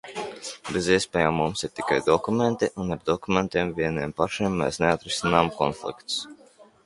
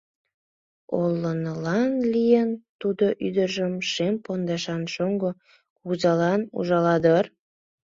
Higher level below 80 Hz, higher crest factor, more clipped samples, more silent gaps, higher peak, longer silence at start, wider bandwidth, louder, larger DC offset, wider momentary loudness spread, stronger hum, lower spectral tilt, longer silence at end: first, -50 dBFS vs -64 dBFS; about the same, 22 dB vs 18 dB; neither; second, none vs 2.69-2.79 s, 5.70-5.76 s; about the same, -4 dBFS vs -6 dBFS; second, 0.05 s vs 0.9 s; first, 11.5 kHz vs 7.6 kHz; about the same, -25 LUFS vs -24 LUFS; neither; about the same, 8 LU vs 10 LU; neither; second, -4.5 dB/octave vs -6.5 dB/octave; second, 0.25 s vs 0.55 s